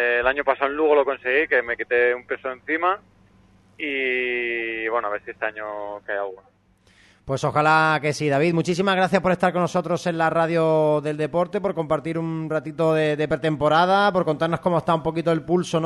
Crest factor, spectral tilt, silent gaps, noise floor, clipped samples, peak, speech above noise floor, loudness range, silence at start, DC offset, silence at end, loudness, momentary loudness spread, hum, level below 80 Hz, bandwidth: 18 dB; -6 dB/octave; none; -58 dBFS; under 0.1%; -4 dBFS; 37 dB; 5 LU; 0 s; under 0.1%; 0 s; -22 LUFS; 10 LU; none; -56 dBFS; 12 kHz